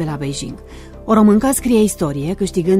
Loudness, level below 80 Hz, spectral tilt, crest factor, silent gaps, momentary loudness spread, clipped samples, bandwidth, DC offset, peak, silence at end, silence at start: -16 LUFS; -36 dBFS; -6 dB/octave; 14 dB; none; 18 LU; under 0.1%; 15.5 kHz; under 0.1%; -2 dBFS; 0 s; 0 s